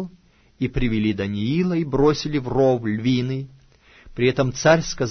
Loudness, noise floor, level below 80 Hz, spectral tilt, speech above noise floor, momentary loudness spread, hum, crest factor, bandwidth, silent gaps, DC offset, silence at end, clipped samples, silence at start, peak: -21 LUFS; -54 dBFS; -38 dBFS; -6 dB/octave; 33 dB; 11 LU; none; 18 dB; 6.6 kHz; none; under 0.1%; 0 s; under 0.1%; 0 s; -2 dBFS